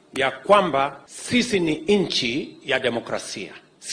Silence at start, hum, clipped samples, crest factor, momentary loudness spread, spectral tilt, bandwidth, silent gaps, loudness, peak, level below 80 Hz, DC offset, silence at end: 0.15 s; none; under 0.1%; 20 dB; 15 LU; -4 dB/octave; 10.5 kHz; none; -22 LUFS; -2 dBFS; -56 dBFS; under 0.1%; 0 s